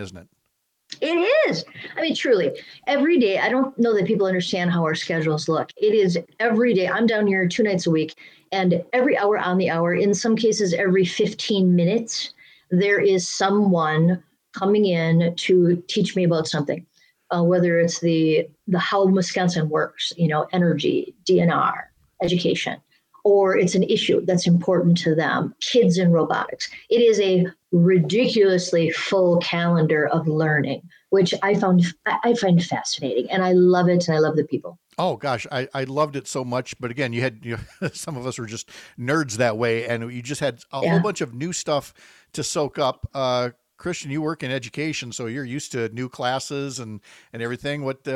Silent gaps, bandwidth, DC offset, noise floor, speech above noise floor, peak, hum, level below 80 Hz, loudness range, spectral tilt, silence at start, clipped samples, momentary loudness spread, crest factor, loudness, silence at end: none; 11.5 kHz; under 0.1%; -73 dBFS; 52 dB; -6 dBFS; none; -60 dBFS; 7 LU; -5.5 dB/octave; 0 s; under 0.1%; 11 LU; 14 dB; -21 LUFS; 0 s